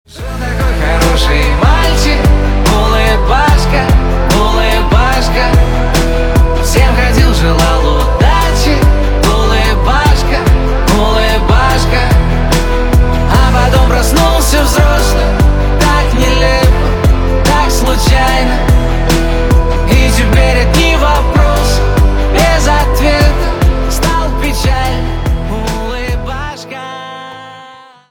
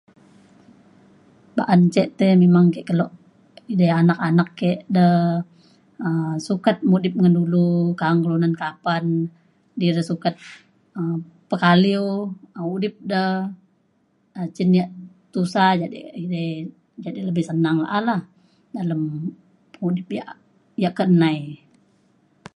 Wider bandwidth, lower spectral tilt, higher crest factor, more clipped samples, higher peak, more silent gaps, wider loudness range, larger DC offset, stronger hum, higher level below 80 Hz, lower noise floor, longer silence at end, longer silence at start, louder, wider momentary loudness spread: first, 19 kHz vs 10.5 kHz; second, -5 dB/octave vs -8 dB/octave; second, 8 dB vs 20 dB; neither; about the same, 0 dBFS vs -2 dBFS; neither; second, 2 LU vs 6 LU; neither; neither; first, -12 dBFS vs -66 dBFS; second, -35 dBFS vs -64 dBFS; second, 0.35 s vs 1 s; second, 0.15 s vs 1.55 s; first, -11 LUFS vs -20 LUFS; second, 7 LU vs 15 LU